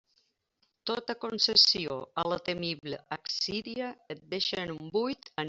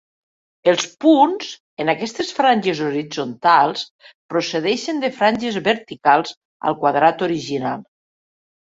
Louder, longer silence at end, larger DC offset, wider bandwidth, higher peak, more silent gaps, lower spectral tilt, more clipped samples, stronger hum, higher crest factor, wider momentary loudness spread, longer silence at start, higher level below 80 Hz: second, -29 LUFS vs -19 LUFS; second, 0 s vs 0.8 s; neither; about the same, 8 kHz vs 7.8 kHz; second, -8 dBFS vs 0 dBFS; second, none vs 1.60-1.77 s, 3.91-3.99 s, 4.15-4.29 s, 6.37-6.60 s; second, -3 dB/octave vs -4.5 dB/octave; neither; neither; first, 24 dB vs 18 dB; first, 16 LU vs 11 LU; first, 0.85 s vs 0.65 s; about the same, -68 dBFS vs -64 dBFS